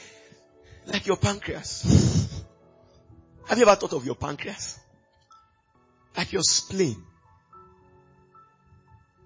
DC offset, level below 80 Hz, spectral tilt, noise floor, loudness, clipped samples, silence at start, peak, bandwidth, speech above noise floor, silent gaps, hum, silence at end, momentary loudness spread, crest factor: under 0.1%; -44 dBFS; -4.5 dB/octave; -64 dBFS; -24 LUFS; under 0.1%; 0 s; -6 dBFS; 8 kHz; 40 dB; none; none; 2.25 s; 19 LU; 22 dB